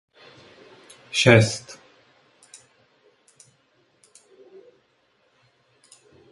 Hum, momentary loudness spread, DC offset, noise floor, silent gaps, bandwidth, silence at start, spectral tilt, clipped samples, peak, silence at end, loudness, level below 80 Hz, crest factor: none; 29 LU; under 0.1%; -65 dBFS; none; 11.5 kHz; 1.15 s; -5 dB/octave; under 0.1%; 0 dBFS; 4.6 s; -19 LUFS; -58 dBFS; 28 dB